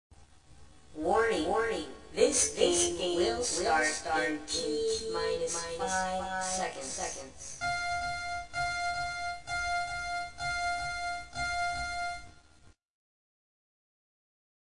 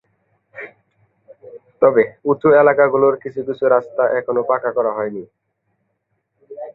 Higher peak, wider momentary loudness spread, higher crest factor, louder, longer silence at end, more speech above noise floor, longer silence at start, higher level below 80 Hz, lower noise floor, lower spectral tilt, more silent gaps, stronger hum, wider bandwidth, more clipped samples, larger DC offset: second, -12 dBFS vs -2 dBFS; second, 10 LU vs 22 LU; about the same, 22 dB vs 18 dB; second, -31 LUFS vs -16 LUFS; first, 1.75 s vs 0.05 s; second, 30 dB vs 55 dB; second, 0.1 s vs 0.55 s; first, -54 dBFS vs -64 dBFS; second, -60 dBFS vs -71 dBFS; second, -2 dB/octave vs -10 dB/octave; neither; neither; first, 10.5 kHz vs 4.1 kHz; neither; first, 0.2% vs under 0.1%